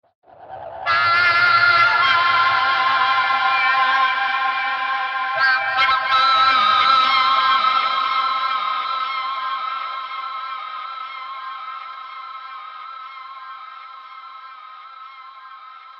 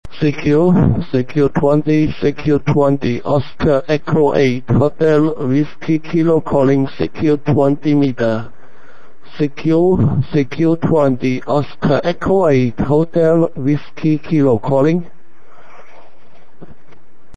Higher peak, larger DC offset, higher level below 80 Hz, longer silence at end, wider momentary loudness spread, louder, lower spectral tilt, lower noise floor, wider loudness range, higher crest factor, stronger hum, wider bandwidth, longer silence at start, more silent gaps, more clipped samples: second, -4 dBFS vs 0 dBFS; second, under 0.1% vs 6%; second, -64 dBFS vs -38 dBFS; second, 0 s vs 2.3 s; first, 23 LU vs 6 LU; about the same, -17 LUFS vs -15 LUFS; second, -2 dB/octave vs -8.5 dB/octave; second, -40 dBFS vs -50 dBFS; first, 19 LU vs 2 LU; about the same, 16 dB vs 16 dB; neither; second, 7.2 kHz vs 9 kHz; first, 0.4 s vs 0 s; neither; neither